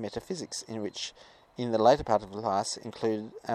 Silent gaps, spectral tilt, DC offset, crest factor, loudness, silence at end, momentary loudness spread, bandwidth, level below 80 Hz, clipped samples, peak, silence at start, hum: none; -4.5 dB/octave; under 0.1%; 22 dB; -30 LUFS; 0 s; 14 LU; 13.5 kHz; -58 dBFS; under 0.1%; -8 dBFS; 0 s; none